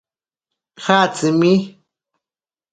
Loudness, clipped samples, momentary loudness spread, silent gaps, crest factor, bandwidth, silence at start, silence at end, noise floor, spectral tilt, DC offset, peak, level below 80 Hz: -16 LUFS; under 0.1%; 12 LU; none; 20 dB; 9.4 kHz; 0.8 s; 1.05 s; under -90 dBFS; -5.5 dB/octave; under 0.1%; 0 dBFS; -64 dBFS